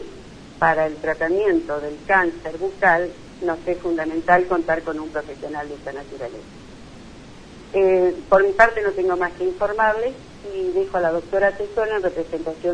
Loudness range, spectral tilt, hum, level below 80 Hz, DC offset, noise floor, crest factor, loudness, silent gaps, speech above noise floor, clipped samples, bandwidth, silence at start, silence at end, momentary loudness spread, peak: 5 LU; -6 dB/octave; none; -46 dBFS; under 0.1%; -41 dBFS; 22 dB; -21 LUFS; none; 20 dB; under 0.1%; 10 kHz; 0 s; 0 s; 15 LU; 0 dBFS